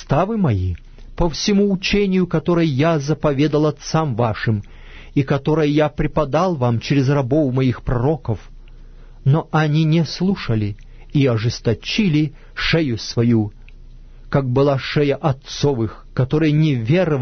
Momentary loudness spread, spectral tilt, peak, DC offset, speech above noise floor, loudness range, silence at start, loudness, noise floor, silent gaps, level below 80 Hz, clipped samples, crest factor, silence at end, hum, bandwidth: 7 LU; -7 dB/octave; -4 dBFS; under 0.1%; 21 dB; 2 LU; 0 s; -19 LUFS; -39 dBFS; none; -36 dBFS; under 0.1%; 14 dB; 0 s; none; 6.6 kHz